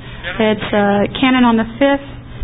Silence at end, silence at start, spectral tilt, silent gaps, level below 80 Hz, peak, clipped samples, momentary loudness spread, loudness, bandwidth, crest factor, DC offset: 0 s; 0 s; -11.5 dB/octave; none; -38 dBFS; 0 dBFS; under 0.1%; 8 LU; -14 LUFS; 4 kHz; 14 dB; 0.5%